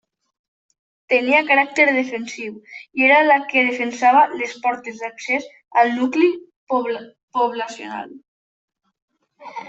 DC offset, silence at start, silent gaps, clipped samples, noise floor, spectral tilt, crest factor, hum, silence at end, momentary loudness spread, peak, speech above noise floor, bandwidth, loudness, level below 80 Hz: under 0.1%; 1.1 s; 6.56-6.67 s, 7.23-7.28 s, 8.28-8.68 s, 9.02-9.08 s; under 0.1%; -37 dBFS; -3 dB/octave; 18 dB; none; 0 s; 17 LU; -2 dBFS; 19 dB; 8.2 kHz; -18 LUFS; -72 dBFS